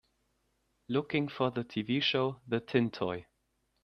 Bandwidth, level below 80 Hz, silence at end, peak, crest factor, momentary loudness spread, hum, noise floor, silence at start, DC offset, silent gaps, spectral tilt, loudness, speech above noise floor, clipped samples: 6.4 kHz; -70 dBFS; 0.6 s; -12 dBFS; 22 dB; 7 LU; none; -78 dBFS; 0.9 s; under 0.1%; none; -7 dB/octave; -32 LUFS; 46 dB; under 0.1%